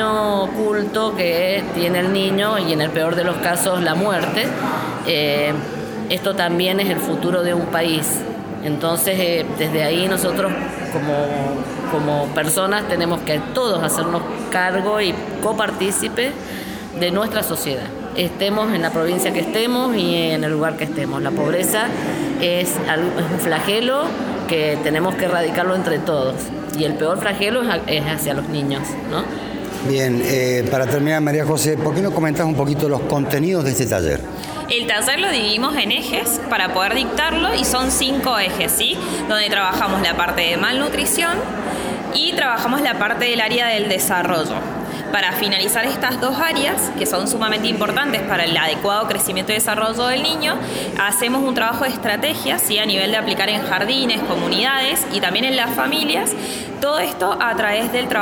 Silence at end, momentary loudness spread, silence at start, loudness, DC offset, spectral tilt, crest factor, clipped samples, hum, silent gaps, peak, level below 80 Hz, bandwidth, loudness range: 0 s; 6 LU; 0 s; -18 LUFS; under 0.1%; -3.5 dB/octave; 16 dB; under 0.1%; none; none; -4 dBFS; -46 dBFS; over 20 kHz; 3 LU